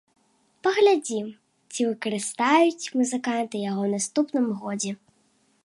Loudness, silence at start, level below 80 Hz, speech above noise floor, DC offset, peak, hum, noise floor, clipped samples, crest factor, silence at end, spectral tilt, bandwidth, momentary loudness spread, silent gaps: -24 LUFS; 0.65 s; -78 dBFS; 42 dB; under 0.1%; -8 dBFS; none; -66 dBFS; under 0.1%; 16 dB; 0.7 s; -4 dB/octave; 11.5 kHz; 12 LU; none